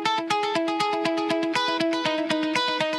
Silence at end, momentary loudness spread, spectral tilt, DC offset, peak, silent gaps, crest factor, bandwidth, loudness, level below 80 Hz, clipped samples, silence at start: 0 s; 2 LU; -3.5 dB/octave; under 0.1%; -8 dBFS; none; 16 dB; 12.5 kHz; -24 LUFS; -72 dBFS; under 0.1%; 0 s